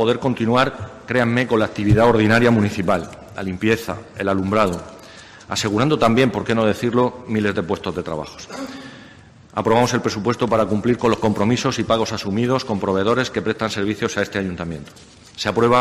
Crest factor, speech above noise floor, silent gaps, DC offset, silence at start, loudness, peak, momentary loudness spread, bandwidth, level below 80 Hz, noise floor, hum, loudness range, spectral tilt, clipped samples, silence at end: 16 dB; 26 dB; none; under 0.1%; 0 s; -19 LUFS; -4 dBFS; 15 LU; 13.5 kHz; -44 dBFS; -45 dBFS; none; 4 LU; -5.5 dB/octave; under 0.1%; 0 s